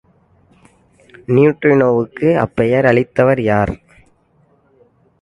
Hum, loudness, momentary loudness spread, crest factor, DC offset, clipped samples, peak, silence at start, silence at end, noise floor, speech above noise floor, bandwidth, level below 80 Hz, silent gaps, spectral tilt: none; -14 LUFS; 6 LU; 16 dB; under 0.1%; under 0.1%; 0 dBFS; 1.3 s; 1.45 s; -56 dBFS; 42 dB; 11 kHz; -44 dBFS; none; -9 dB/octave